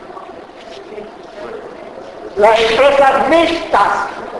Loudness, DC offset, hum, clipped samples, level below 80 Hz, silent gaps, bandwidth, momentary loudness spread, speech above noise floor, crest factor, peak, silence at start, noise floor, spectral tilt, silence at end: -12 LUFS; under 0.1%; none; under 0.1%; -44 dBFS; none; 12 kHz; 22 LU; 22 dB; 14 dB; 0 dBFS; 0 s; -33 dBFS; -3.5 dB/octave; 0 s